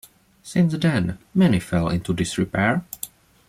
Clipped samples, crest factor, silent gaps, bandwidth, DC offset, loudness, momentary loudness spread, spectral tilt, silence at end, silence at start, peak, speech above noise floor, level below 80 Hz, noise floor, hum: under 0.1%; 16 dB; none; 16 kHz; under 0.1%; -22 LUFS; 9 LU; -6 dB/octave; 0.4 s; 0.45 s; -8 dBFS; 19 dB; -48 dBFS; -40 dBFS; none